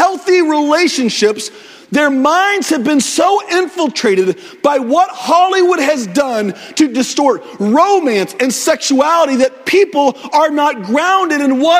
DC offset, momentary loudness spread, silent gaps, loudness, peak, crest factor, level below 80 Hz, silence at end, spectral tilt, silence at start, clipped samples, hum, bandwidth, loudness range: under 0.1%; 5 LU; none; -13 LUFS; 0 dBFS; 12 dB; -62 dBFS; 0 s; -3.5 dB/octave; 0 s; under 0.1%; none; 16 kHz; 1 LU